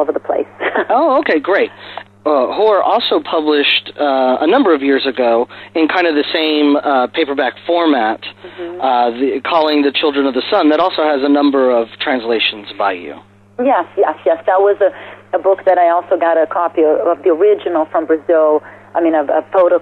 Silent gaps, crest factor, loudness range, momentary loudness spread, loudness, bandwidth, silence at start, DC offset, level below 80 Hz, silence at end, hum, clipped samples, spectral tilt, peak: none; 10 dB; 2 LU; 7 LU; -14 LUFS; 5.6 kHz; 0 s; under 0.1%; -62 dBFS; 0 s; none; under 0.1%; -6 dB/octave; -4 dBFS